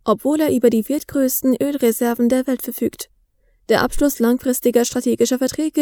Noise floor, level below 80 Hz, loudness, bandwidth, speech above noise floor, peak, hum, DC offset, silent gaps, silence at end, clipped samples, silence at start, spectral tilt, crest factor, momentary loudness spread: -59 dBFS; -42 dBFS; -18 LUFS; over 20 kHz; 42 dB; -2 dBFS; none; under 0.1%; none; 0 s; under 0.1%; 0.05 s; -4 dB/octave; 16 dB; 6 LU